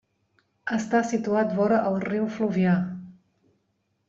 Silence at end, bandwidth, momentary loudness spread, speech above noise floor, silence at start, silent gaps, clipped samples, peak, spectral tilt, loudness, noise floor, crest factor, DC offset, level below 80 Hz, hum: 0.95 s; 7.6 kHz; 9 LU; 50 dB; 0.65 s; none; under 0.1%; -10 dBFS; -7 dB/octave; -25 LUFS; -73 dBFS; 16 dB; under 0.1%; -66 dBFS; none